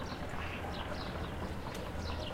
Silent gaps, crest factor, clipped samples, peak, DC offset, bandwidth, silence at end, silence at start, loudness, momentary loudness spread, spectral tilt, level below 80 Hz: none; 14 dB; under 0.1%; -26 dBFS; under 0.1%; 16 kHz; 0 s; 0 s; -41 LUFS; 1 LU; -5.5 dB/octave; -46 dBFS